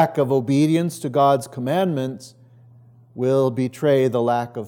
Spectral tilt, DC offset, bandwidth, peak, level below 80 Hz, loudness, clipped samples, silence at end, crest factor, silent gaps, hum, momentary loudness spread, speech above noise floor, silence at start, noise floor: -7 dB/octave; under 0.1%; 18 kHz; -4 dBFS; -76 dBFS; -20 LUFS; under 0.1%; 0 s; 16 dB; none; none; 7 LU; 29 dB; 0 s; -49 dBFS